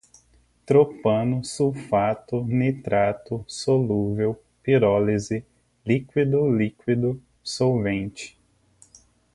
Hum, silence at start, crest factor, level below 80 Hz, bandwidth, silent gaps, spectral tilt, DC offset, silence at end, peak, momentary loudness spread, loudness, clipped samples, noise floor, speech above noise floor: 60 Hz at -50 dBFS; 0.7 s; 18 dB; -54 dBFS; 11.5 kHz; none; -7 dB/octave; under 0.1%; 1.05 s; -6 dBFS; 12 LU; -23 LUFS; under 0.1%; -60 dBFS; 38 dB